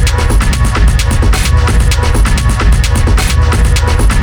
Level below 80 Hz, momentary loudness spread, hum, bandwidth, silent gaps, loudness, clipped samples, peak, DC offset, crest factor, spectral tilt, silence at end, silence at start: -10 dBFS; 1 LU; none; 19.5 kHz; none; -11 LUFS; under 0.1%; 0 dBFS; under 0.1%; 8 dB; -5 dB/octave; 0 s; 0 s